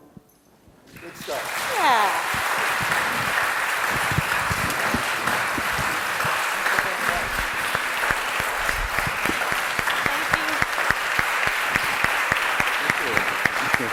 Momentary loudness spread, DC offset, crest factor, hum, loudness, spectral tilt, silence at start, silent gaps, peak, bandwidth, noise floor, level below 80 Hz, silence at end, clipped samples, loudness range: 3 LU; under 0.1%; 20 dB; none; -22 LUFS; -2.5 dB/octave; 0.9 s; none; -2 dBFS; over 20 kHz; -55 dBFS; -44 dBFS; 0 s; under 0.1%; 2 LU